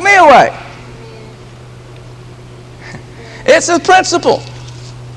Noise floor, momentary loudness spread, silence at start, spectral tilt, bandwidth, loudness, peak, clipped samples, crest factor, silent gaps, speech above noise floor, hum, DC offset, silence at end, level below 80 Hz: -33 dBFS; 27 LU; 0 s; -3.5 dB/octave; 12 kHz; -9 LUFS; 0 dBFS; 0.7%; 12 dB; none; 24 dB; none; under 0.1%; 0 s; -42 dBFS